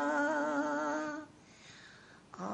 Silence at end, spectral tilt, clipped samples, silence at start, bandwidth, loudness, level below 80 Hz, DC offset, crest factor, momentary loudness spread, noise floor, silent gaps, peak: 0 s; -4.5 dB/octave; under 0.1%; 0 s; 9 kHz; -35 LUFS; -76 dBFS; under 0.1%; 16 dB; 23 LU; -57 dBFS; none; -22 dBFS